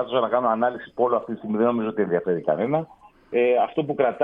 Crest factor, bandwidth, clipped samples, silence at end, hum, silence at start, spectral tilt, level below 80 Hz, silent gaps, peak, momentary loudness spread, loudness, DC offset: 16 dB; 3.8 kHz; under 0.1%; 0 s; none; 0 s; -9.5 dB/octave; -64 dBFS; none; -6 dBFS; 6 LU; -23 LUFS; under 0.1%